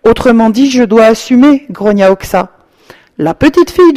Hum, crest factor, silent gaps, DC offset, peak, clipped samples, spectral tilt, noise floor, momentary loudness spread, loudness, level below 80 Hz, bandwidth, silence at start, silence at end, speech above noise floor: none; 8 dB; none; under 0.1%; 0 dBFS; 2%; -6 dB/octave; -40 dBFS; 8 LU; -8 LUFS; -34 dBFS; 15.5 kHz; 0.05 s; 0 s; 33 dB